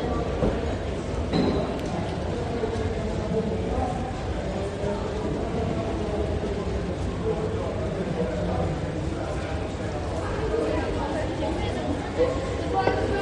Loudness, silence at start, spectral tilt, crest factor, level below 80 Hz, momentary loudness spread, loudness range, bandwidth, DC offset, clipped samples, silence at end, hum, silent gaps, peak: -28 LUFS; 0 s; -7 dB/octave; 18 dB; -36 dBFS; 5 LU; 1 LU; 10.5 kHz; under 0.1%; under 0.1%; 0 s; none; none; -8 dBFS